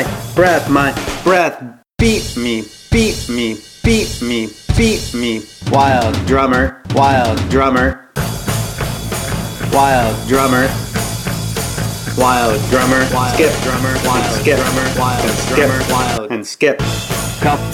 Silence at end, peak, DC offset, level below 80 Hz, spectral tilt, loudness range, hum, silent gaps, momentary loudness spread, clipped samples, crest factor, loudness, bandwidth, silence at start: 0 s; 0 dBFS; under 0.1%; -28 dBFS; -4.5 dB/octave; 2 LU; none; none; 8 LU; under 0.1%; 14 dB; -15 LUFS; 17.5 kHz; 0 s